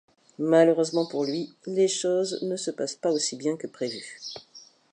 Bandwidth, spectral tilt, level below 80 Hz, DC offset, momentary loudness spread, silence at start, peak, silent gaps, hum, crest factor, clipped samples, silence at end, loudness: 11 kHz; -4 dB/octave; -80 dBFS; under 0.1%; 15 LU; 0.4 s; -8 dBFS; none; none; 20 dB; under 0.1%; 0.35 s; -26 LUFS